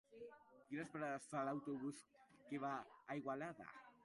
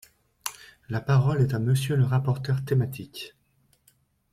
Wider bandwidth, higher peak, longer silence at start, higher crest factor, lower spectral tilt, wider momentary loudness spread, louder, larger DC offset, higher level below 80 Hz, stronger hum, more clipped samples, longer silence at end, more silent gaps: second, 11.5 kHz vs 15.5 kHz; second, -32 dBFS vs -4 dBFS; second, 0.1 s vs 0.45 s; about the same, 18 dB vs 22 dB; about the same, -6 dB/octave vs -6.5 dB/octave; about the same, 15 LU vs 15 LU; second, -48 LUFS vs -26 LUFS; neither; second, -88 dBFS vs -56 dBFS; neither; neither; second, 0 s vs 1.05 s; neither